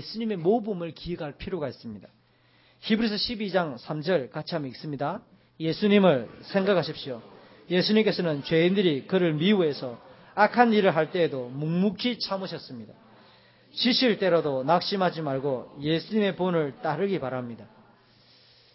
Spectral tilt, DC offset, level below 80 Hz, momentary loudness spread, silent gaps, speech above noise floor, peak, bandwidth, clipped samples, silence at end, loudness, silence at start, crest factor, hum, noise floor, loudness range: -9.5 dB/octave; under 0.1%; -60 dBFS; 14 LU; none; 36 dB; -6 dBFS; 5.8 kHz; under 0.1%; 1.1 s; -26 LUFS; 0 s; 22 dB; none; -61 dBFS; 6 LU